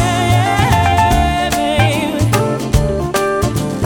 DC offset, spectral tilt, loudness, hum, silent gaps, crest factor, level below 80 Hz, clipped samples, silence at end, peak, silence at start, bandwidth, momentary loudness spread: under 0.1%; -5.5 dB/octave; -14 LUFS; none; none; 14 dB; -24 dBFS; under 0.1%; 0 s; 0 dBFS; 0 s; 19 kHz; 4 LU